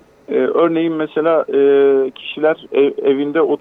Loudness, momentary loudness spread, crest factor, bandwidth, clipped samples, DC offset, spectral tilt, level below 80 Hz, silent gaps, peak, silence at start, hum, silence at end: -15 LUFS; 6 LU; 10 dB; 3.9 kHz; under 0.1%; under 0.1%; -8 dB/octave; -64 dBFS; none; -4 dBFS; 0.3 s; none; 0.05 s